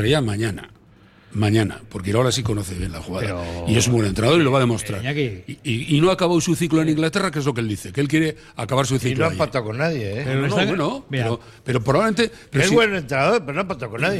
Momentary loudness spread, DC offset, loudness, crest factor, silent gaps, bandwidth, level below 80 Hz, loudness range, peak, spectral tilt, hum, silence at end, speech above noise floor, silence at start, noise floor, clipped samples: 9 LU; under 0.1%; -21 LUFS; 16 dB; none; 15 kHz; -44 dBFS; 3 LU; -4 dBFS; -5.5 dB/octave; none; 0 s; 30 dB; 0 s; -50 dBFS; under 0.1%